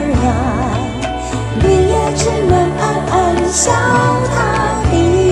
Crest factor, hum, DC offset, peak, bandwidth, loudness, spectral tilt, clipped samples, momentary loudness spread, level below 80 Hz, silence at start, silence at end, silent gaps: 12 dB; none; 0.2%; 0 dBFS; 12 kHz; -14 LUFS; -5 dB/octave; under 0.1%; 7 LU; -24 dBFS; 0 s; 0 s; none